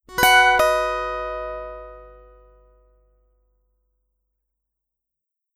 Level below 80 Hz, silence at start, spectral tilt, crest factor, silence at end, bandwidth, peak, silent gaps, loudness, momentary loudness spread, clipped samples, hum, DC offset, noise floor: -46 dBFS; 0.1 s; -1.5 dB/octave; 22 dB; 3.45 s; 16 kHz; -2 dBFS; none; -18 LUFS; 21 LU; under 0.1%; 50 Hz at -50 dBFS; under 0.1%; -84 dBFS